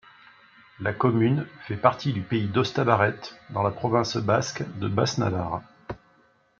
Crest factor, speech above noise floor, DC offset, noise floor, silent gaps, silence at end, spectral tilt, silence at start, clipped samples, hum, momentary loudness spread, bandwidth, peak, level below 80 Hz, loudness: 22 dB; 37 dB; under 0.1%; -62 dBFS; none; 0.6 s; -6 dB/octave; 0.8 s; under 0.1%; none; 12 LU; 7.6 kHz; -4 dBFS; -58 dBFS; -25 LUFS